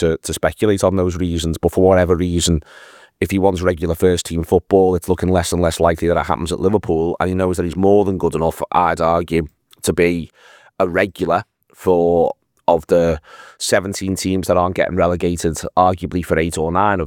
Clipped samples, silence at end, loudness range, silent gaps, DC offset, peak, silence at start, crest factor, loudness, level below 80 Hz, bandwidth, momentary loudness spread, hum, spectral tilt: under 0.1%; 0 s; 2 LU; none; under 0.1%; 0 dBFS; 0 s; 16 dB; -17 LUFS; -40 dBFS; 19.5 kHz; 7 LU; none; -5.5 dB/octave